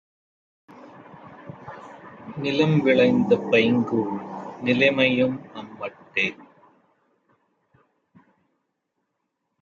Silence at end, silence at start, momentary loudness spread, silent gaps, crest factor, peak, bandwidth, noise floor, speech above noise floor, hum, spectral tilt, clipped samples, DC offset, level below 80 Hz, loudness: 3.2 s; 0.85 s; 23 LU; none; 20 dB; -6 dBFS; 7.2 kHz; -78 dBFS; 57 dB; none; -7 dB/octave; under 0.1%; under 0.1%; -66 dBFS; -21 LUFS